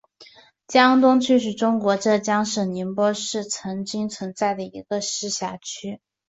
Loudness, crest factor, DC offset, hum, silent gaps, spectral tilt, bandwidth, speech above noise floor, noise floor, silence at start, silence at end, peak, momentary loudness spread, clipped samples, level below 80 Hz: -22 LUFS; 20 dB; under 0.1%; none; none; -4 dB/octave; 8 kHz; 29 dB; -50 dBFS; 0.2 s; 0.35 s; -2 dBFS; 13 LU; under 0.1%; -66 dBFS